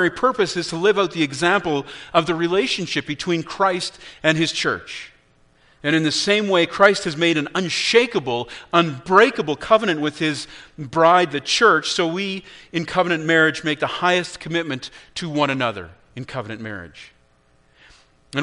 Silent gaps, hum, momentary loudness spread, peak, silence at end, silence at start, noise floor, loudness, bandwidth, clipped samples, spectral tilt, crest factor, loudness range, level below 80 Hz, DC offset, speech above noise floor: none; none; 15 LU; 0 dBFS; 0 s; 0 s; -58 dBFS; -19 LUFS; 10.5 kHz; under 0.1%; -4 dB/octave; 20 dB; 6 LU; -56 dBFS; under 0.1%; 38 dB